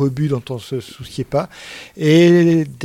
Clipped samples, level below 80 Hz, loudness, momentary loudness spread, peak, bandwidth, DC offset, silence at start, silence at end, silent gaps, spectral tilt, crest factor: under 0.1%; -50 dBFS; -15 LUFS; 19 LU; -2 dBFS; 14 kHz; under 0.1%; 0 s; 0 s; none; -7 dB/octave; 14 dB